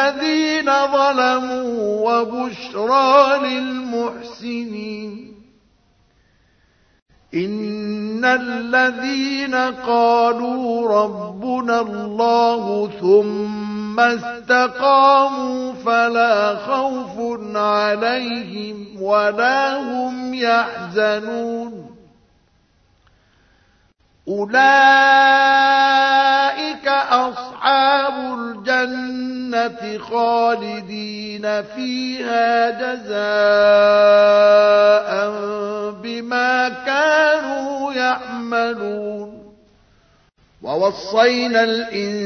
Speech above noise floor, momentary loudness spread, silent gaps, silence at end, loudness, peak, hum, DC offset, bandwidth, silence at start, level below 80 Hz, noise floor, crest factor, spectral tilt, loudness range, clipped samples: 41 dB; 14 LU; 7.02-7.06 s; 0 s; -17 LUFS; 0 dBFS; none; under 0.1%; 6.6 kHz; 0 s; -60 dBFS; -58 dBFS; 18 dB; -4 dB/octave; 10 LU; under 0.1%